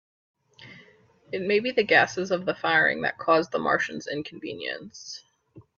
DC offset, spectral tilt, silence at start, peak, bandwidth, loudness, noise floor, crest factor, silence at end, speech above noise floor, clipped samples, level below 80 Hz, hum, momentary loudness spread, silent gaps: under 0.1%; -4 dB/octave; 0.6 s; -6 dBFS; 7.6 kHz; -24 LUFS; -57 dBFS; 20 dB; 0.15 s; 32 dB; under 0.1%; -68 dBFS; none; 17 LU; none